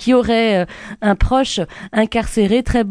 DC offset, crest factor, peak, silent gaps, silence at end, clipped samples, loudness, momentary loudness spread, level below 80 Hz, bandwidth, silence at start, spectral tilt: under 0.1%; 14 dB; -2 dBFS; none; 0 s; under 0.1%; -17 LUFS; 7 LU; -28 dBFS; 11 kHz; 0 s; -5.5 dB/octave